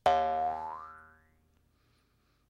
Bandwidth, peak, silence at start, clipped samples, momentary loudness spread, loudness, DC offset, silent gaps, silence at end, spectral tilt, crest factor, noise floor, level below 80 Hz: 11.5 kHz; -14 dBFS; 0.05 s; under 0.1%; 22 LU; -32 LUFS; under 0.1%; none; 1.45 s; -4.5 dB/octave; 22 dB; -72 dBFS; -62 dBFS